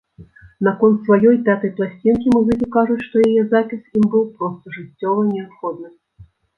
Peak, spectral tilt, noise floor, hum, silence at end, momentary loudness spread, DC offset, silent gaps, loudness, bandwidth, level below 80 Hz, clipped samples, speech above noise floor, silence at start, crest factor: -2 dBFS; -9 dB/octave; -47 dBFS; none; 0.35 s; 14 LU; under 0.1%; none; -17 LUFS; 6 kHz; -52 dBFS; under 0.1%; 31 dB; 0.2 s; 16 dB